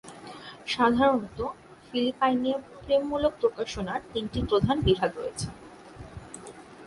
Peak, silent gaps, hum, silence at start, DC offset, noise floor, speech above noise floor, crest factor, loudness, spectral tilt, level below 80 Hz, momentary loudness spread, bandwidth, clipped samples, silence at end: -8 dBFS; none; none; 0.05 s; under 0.1%; -46 dBFS; 19 dB; 20 dB; -27 LUFS; -5.5 dB/octave; -46 dBFS; 20 LU; 11.5 kHz; under 0.1%; 0 s